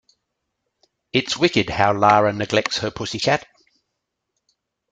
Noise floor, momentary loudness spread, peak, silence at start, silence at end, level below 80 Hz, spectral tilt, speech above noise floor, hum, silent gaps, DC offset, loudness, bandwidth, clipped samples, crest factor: -78 dBFS; 8 LU; -2 dBFS; 1.15 s; 1.5 s; -52 dBFS; -4.5 dB/octave; 59 dB; none; none; under 0.1%; -19 LUFS; 9.4 kHz; under 0.1%; 20 dB